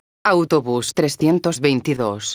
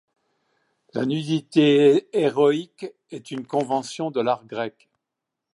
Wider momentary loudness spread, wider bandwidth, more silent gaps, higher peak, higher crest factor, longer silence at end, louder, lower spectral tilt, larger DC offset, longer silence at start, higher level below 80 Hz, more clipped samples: second, 4 LU vs 17 LU; first, over 20 kHz vs 11 kHz; neither; first, -2 dBFS vs -6 dBFS; about the same, 16 dB vs 18 dB; second, 0 s vs 0.85 s; first, -19 LUFS vs -22 LUFS; about the same, -5 dB/octave vs -6 dB/octave; neither; second, 0.25 s vs 0.95 s; first, -58 dBFS vs -76 dBFS; neither